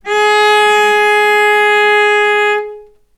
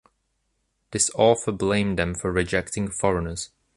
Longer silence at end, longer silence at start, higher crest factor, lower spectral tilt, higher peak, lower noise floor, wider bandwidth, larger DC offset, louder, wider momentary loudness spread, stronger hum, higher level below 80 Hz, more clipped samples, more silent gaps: about the same, 0.35 s vs 0.3 s; second, 0.05 s vs 0.9 s; second, 10 dB vs 20 dB; second, -0.5 dB/octave vs -4 dB/octave; first, 0 dBFS vs -4 dBFS; second, -33 dBFS vs -73 dBFS; first, 14.5 kHz vs 11.5 kHz; neither; first, -9 LUFS vs -23 LUFS; second, 5 LU vs 10 LU; neither; second, -56 dBFS vs -44 dBFS; neither; neither